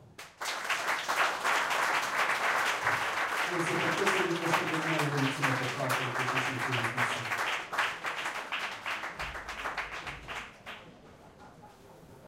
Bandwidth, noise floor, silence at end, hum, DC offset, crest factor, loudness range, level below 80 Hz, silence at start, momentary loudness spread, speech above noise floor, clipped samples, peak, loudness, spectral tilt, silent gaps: 16.5 kHz; -54 dBFS; 0 s; none; under 0.1%; 20 dB; 9 LU; -62 dBFS; 0 s; 10 LU; 24 dB; under 0.1%; -14 dBFS; -31 LUFS; -3.5 dB/octave; none